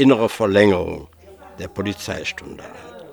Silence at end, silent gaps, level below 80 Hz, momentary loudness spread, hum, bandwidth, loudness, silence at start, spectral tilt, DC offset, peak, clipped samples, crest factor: 0 s; none; -52 dBFS; 22 LU; none; over 20 kHz; -19 LUFS; 0 s; -6 dB/octave; under 0.1%; 0 dBFS; under 0.1%; 20 dB